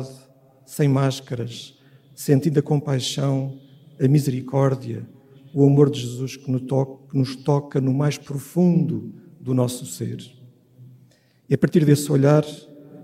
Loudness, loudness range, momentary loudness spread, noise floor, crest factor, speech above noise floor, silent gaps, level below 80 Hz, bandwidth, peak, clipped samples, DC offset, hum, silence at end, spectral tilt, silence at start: -21 LUFS; 3 LU; 15 LU; -56 dBFS; 20 dB; 35 dB; none; -62 dBFS; 15.5 kHz; -2 dBFS; under 0.1%; under 0.1%; none; 0 s; -7 dB/octave; 0 s